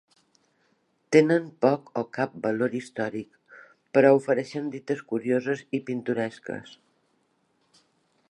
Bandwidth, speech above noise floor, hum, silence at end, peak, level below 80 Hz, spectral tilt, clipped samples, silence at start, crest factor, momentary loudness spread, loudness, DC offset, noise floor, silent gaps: 11 kHz; 45 dB; none; 1.7 s; -4 dBFS; -76 dBFS; -6.5 dB/octave; under 0.1%; 1.1 s; 22 dB; 13 LU; -25 LUFS; under 0.1%; -70 dBFS; none